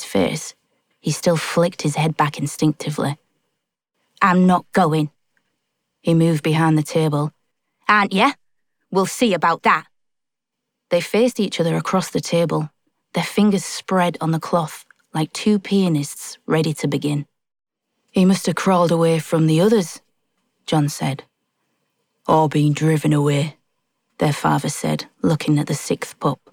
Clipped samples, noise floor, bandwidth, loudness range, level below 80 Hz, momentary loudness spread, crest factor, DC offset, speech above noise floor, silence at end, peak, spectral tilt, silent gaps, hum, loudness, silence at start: under 0.1%; -81 dBFS; 17.5 kHz; 3 LU; -58 dBFS; 11 LU; 18 dB; under 0.1%; 63 dB; 0.2 s; -2 dBFS; -6 dB/octave; none; none; -19 LUFS; 0 s